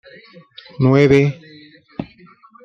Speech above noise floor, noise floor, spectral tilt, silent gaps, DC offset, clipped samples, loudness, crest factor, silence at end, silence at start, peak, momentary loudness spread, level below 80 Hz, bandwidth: 32 dB; -47 dBFS; -8 dB/octave; none; under 0.1%; under 0.1%; -14 LUFS; 16 dB; 0.6 s; 0.8 s; -2 dBFS; 25 LU; -48 dBFS; 7.4 kHz